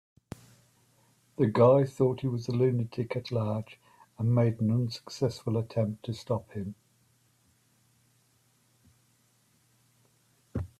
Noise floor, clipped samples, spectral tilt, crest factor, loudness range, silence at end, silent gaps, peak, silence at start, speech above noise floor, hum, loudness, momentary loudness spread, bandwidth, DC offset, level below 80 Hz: -68 dBFS; under 0.1%; -8 dB/octave; 22 dB; 14 LU; 0.1 s; none; -8 dBFS; 1.4 s; 40 dB; none; -29 LUFS; 19 LU; 12 kHz; under 0.1%; -64 dBFS